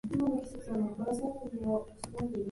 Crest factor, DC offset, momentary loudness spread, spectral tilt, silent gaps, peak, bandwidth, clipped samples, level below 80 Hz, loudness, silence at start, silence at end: 14 dB; under 0.1%; 6 LU; -7 dB/octave; none; -20 dBFS; 11.5 kHz; under 0.1%; -56 dBFS; -36 LUFS; 0.05 s; 0 s